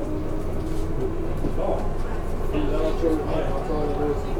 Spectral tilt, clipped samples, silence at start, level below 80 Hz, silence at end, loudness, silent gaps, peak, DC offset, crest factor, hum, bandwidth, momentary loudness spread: -7.5 dB/octave; under 0.1%; 0 s; -26 dBFS; 0 s; -27 LUFS; none; -8 dBFS; under 0.1%; 14 dB; none; 11 kHz; 6 LU